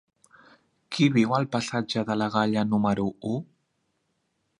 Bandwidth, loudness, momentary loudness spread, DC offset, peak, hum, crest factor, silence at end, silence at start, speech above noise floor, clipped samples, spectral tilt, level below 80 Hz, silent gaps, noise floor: 11 kHz; -26 LUFS; 10 LU; under 0.1%; -8 dBFS; none; 20 dB; 1.15 s; 0.9 s; 50 dB; under 0.1%; -6 dB/octave; -62 dBFS; none; -75 dBFS